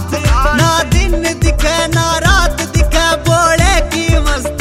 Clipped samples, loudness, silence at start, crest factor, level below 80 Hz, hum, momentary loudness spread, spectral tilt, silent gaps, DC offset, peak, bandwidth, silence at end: under 0.1%; -12 LUFS; 0 s; 12 dB; -16 dBFS; none; 4 LU; -4 dB/octave; none; under 0.1%; 0 dBFS; 16 kHz; 0 s